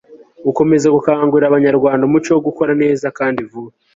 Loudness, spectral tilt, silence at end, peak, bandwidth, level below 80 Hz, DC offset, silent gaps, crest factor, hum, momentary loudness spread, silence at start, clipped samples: -14 LUFS; -7 dB/octave; 0.25 s; 0 dBFS; 7.8 kHz; -54 dBFS; under 0.1%; none; 14 dB; none; 9 LU; 0.1 s; under 0.1%